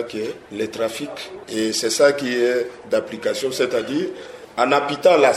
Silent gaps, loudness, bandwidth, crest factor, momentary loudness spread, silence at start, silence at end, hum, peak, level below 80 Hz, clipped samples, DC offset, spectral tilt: none; -21 LUFS; 14.5 kHz; 18 dB; 13 LU; 0 s; 0 s; none; -2 dBFS; -62 dBFS; under 0.1%; under 0.1%; -3 dB/octave